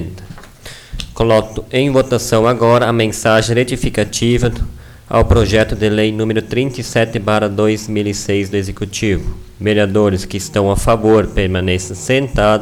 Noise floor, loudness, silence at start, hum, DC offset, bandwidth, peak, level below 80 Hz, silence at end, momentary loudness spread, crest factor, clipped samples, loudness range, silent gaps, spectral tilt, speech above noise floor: -35 dBFS; -15 LUFS; 0 s; none; under 0.1%; 17.5 kHz; -2 dBFS; -28 dBFS; 0 s; 9 LU; 12 dB; under 0.1%; 3 LU; none; -5.5 dB/octave; 21 dB